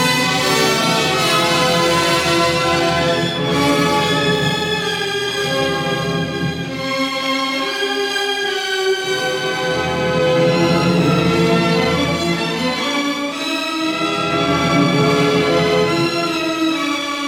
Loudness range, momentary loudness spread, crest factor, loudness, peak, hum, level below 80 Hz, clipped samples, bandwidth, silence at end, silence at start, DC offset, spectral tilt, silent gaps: 4 LU; 5 LU; 14 dB; -16 LUFS; -2 dBFS; none; -50 dBFS; under 0.1%; 17.5 kHz; 0 s; 0 s; under 0.1%; -4 dB/octave; none